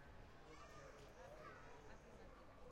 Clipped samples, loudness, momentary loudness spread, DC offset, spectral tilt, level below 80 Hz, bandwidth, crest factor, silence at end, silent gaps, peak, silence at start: under 0.1%; -61 LUFS; 4 LU; under 0.1%; -5 dB/octave; -68 dBFS; 16 kHz; 14 dB; 0 s; none; -46 dBFS; 0 s